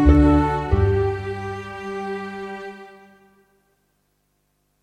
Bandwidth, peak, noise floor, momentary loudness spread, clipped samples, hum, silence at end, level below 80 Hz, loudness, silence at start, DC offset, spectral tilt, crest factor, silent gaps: 8.4 kHz; -2 dBFS; -69 dBFS; 18 LU; under 0.1%; 50 Hz at -45 dBFS; 1.95 s; -28 dBFS; -22 LUFS; 0 s; under 0.1%; -9 dB/octave; 20 dB; none